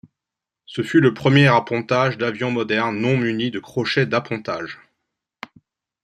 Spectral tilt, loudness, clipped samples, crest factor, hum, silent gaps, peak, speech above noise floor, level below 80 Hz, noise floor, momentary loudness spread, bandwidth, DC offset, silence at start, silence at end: -6.5 dB/octave; -19 LUFS; under 0.1%; 20 dB; none; none; -2 dBFS; 67 dB; -60 dBFS; -86 dBFS; 20 LU; 10.5 kHz; under 0.1%; 0.7 s; 1.3 s